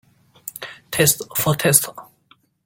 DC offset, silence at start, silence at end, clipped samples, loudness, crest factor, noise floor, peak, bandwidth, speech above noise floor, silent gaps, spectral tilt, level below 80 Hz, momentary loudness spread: under 0.1%; 0.45 s; 0.6 s; under 0.1%; -17 LUFS; 22 dB; -58 dBFS; 0 dBFS; 17 kHz; 39 dB; none; -3 dB/octave; -56 dBFS; 19 LU